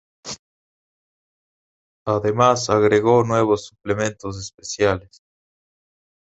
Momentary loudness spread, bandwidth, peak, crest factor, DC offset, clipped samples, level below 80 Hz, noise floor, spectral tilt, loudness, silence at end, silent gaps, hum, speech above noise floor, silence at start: 17 LU; 8.2 kHz; -2 dBFS; 20 dB; under 0.1%; under 0.1%; -50 dBFS; under -90 dBFS; -5 dB/octave; -19 LUFS; 1.35 s; 0.39-2.05 s, 4.54-4.58 s; none; over 71 dB; 0.25 s